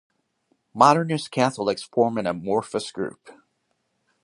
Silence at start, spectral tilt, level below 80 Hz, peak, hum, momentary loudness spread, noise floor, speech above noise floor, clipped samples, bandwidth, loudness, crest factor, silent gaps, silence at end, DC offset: 0.75 s; -5.5 dB/octave; -66 dBFS; -2 dBFS; none; 14 LU; -73 dBFS; 51 dB; under 0.1%; 11.5 kHz; -23 LUFS; 24 dB; none; 0.95 s; under 0.1%